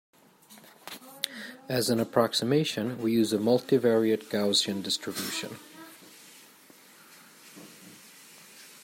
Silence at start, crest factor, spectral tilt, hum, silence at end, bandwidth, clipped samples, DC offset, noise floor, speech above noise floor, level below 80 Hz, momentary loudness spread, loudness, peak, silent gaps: 0.5 s; 22 dB; -4.5 dB/octave; none; 0.05 s; 16 kHz; under 0.1%; under 0.1%; -55 dBFS; 29 dB; -76 dBFS; 24 LU; -27 LUFS; -8 dBFS; none